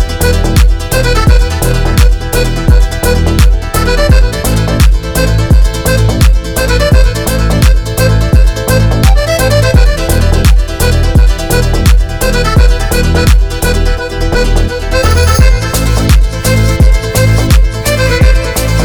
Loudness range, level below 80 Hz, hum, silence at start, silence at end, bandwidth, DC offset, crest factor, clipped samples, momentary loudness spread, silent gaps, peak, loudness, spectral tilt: 1 LU; -10 dBFS; none; 0 s; 0 s; 20 kHz; under 0.1%; 8 dB; 0.3%; 4 LU; none; 0 dBFS; -10 LUFS; -5 dB/octave